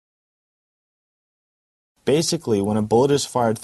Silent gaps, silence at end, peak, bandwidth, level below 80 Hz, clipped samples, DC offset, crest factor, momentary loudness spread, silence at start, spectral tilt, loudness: none; 0 s; -4 dBFS; 12 kHz; -56 dBFS; under 0.1%; under 0.1%; 18 dB; 4 LU; 2.05 s; -5 dB/octave; -20 LUFS